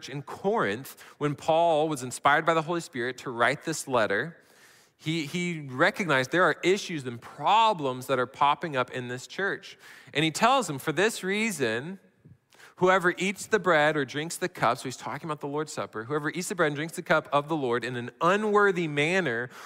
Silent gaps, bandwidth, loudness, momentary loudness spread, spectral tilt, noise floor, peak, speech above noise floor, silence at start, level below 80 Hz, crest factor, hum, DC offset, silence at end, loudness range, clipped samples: none; 16 kHz; -27 LUFS; 12 LU; -4.5 dB/octave; -58 dBFS; -8 dBFS; 31 dB; 0 s; -70 dBFS; 18 dB; none; under 0.1%; 0 s; 3 LU; under 0.1%